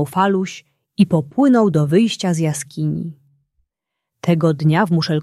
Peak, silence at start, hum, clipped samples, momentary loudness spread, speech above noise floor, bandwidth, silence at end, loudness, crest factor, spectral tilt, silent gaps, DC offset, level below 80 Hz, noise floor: -2 dBFS; 0 s; none; under 0.1%; 12 LU; 64 dB; 13 kHz; 0 s; -17 LUFS; 16 dB; -6.5 dB/octave; none; under 0.1%; -58 dBFS; -81 dBFS